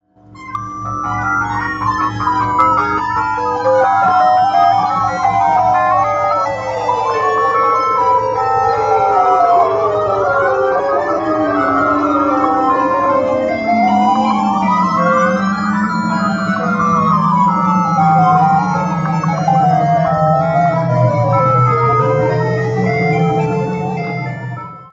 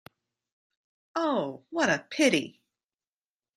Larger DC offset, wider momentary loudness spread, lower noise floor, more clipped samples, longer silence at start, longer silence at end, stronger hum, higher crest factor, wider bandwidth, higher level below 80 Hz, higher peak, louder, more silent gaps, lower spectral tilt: neither; second, 6 LU vs 11 LU; second, -36 dBFS vs under -90 dBFS; neither; second, 0.3 s vs 1.15 s; second, 0.05 s vs 1.05 s; neither; second, 12 dB vs 22 dB; second, 7.8 kHz vs 12.5 kHz; first, -46 dBFS vs -72 dBFS; first, -2 dBFS vs -10 dBFS; first, -14 LUFS vs -27 LUFS; neither; first, -7.5 dB/octave vs -3.5 dB/octave